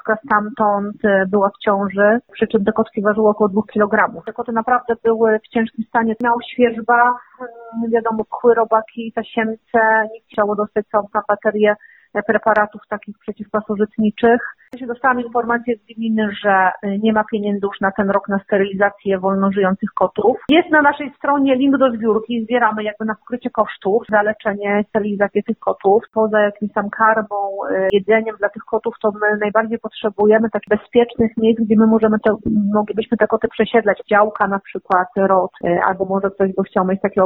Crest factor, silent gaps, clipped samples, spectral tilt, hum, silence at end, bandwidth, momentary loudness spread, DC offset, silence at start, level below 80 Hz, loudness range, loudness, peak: 16 dB; none; under 0.1%; -9.5 dB/octave; none; 0 s; 4.1 kHz; 8 LU; under 0.1%; 0.05 s; -54 dBFS; 3 LU; -17 LUFS; 0 dBFS